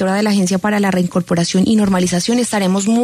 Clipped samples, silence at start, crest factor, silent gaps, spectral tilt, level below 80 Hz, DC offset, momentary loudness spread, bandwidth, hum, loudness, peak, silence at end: under 0.1%; 0 s; 10 dB; none; -5 dB/octave; -48 dBFS; under 0.1%; 3 LU; 13.5 kHz; none; -15 LUFS; -4 dBFS; 0 s